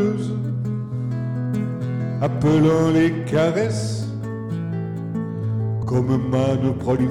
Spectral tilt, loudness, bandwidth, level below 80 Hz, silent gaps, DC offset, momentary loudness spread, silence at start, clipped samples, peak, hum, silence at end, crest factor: -8 dB/octave; -22 LUFS; 11.5 kHz; -46 dBFS; none; under 0.1%; 10 LU; 0 s; under 0.1%; -8 dBFS; none; 0 s; 12 dB